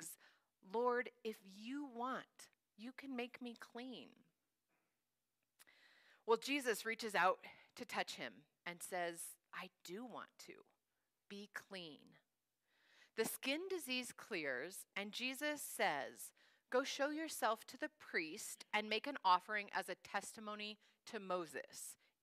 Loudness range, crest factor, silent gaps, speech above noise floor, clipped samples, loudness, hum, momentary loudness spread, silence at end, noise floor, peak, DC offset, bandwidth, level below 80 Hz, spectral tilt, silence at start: 13 LU; 24 dB; none; over 46 dB; under 0.1%; -44 LUFS; none; 17 LU; 0.3 s; under -90 dBFS; -22 dBFS; under 0.1%; 15.5 kHz; under -90 dBFS; -2.5 dB/octave; 0 s